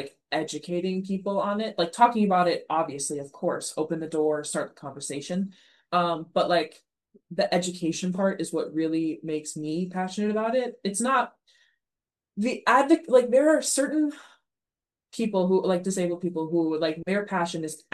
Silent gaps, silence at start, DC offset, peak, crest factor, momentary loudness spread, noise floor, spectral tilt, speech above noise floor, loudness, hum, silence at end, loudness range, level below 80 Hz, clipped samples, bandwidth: none; 0 s; under 0.1%; -6 dBFS; 22 dB; 11 LU; under -90 dBFS; -4.5 dB/octave; over 64 dB; -26 LUFS; none; 0.15 s; 5 LU; -76 dBFS; under 0.1%; 12.5 kHz